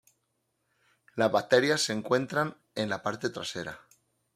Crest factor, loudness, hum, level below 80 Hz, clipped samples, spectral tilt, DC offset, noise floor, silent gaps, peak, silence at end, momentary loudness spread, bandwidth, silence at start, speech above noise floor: 22 dB; -29 LUFS; none; -72 dBFS; under 0.1%; -4 dB/octave; under 0.1%; -78 dBFS; none; -8 dBFS; 0.6 s; 15 LU; 15.5 kHz; 1.15 s; 49 dB